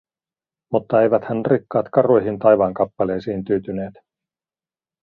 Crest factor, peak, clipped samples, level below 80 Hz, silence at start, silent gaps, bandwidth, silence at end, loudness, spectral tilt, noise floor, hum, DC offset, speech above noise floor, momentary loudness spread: 18 dB; -2 dBFS; under 0.1%; -56 dBFS; 0.7 s; none; 5 kHz; 1.15 s; -19 LUFS; -10.5 dB/octave; under -90 dBFS; none; under 0.1%; over 72 dB; 9 LU